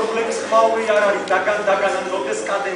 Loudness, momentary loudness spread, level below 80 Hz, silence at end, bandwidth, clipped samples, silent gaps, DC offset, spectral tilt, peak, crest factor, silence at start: -18 LUFS; 6 LU; -62 dBFS; 0 s; 10.5 kHz; under 0.1%; none; under 0.1%; -3 dB/octave; -4 dBFS; 16 dB; 0 s